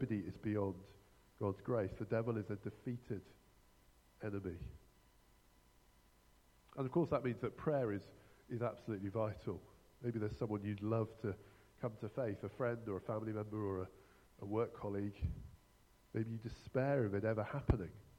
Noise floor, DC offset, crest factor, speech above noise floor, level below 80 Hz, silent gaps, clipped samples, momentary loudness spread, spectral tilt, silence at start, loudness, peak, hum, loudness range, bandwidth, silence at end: -69 dBFS; under 0.1%; 24 dB; 29 dB; -58 dBFS; none; under 0.1%; 11 LU; -9 dB/octave; 0 s; -42 LUFS; -18 dBFS; 60 Hz at -70 dBFS; 8 LU; 15.5 kHz; 0.1 s